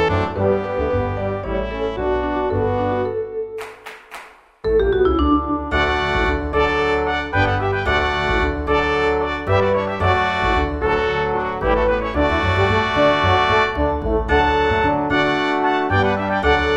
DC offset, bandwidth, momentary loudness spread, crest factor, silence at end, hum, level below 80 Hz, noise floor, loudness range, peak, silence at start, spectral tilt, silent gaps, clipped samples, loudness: 0.3%; 10 kHz; 7 LU; 16 dB; 0 s; none; -30 dBFS; -40 dBFS; 5 LU; -2 dBFS; 0 s; -6.5 dB/octave; none; under 0.1%; -19 LUFS